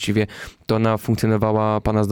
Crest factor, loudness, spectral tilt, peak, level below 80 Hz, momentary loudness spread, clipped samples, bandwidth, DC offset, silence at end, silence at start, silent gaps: 12 dB; -20 LUFS; -7 dB/octave; -8 dBFS; -40 dBFS; 6 LU; under 0.1%; 18 kHz; under 0.1%; 0 s; 0 s; none